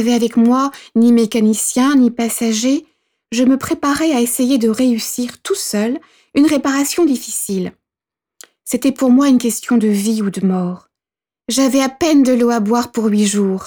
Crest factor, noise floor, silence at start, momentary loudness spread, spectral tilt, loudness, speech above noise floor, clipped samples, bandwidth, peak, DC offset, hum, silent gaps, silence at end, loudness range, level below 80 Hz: 12 dB; under -90 dBFS; 0 s; 9 LU; -4.5 dB/octave; -15 LUFS; over 76 dB; under 0.1%; over 20 kHz; -4 dBFS; under 0.1%; none; none; 0 s; 3 LU; -56 dBFS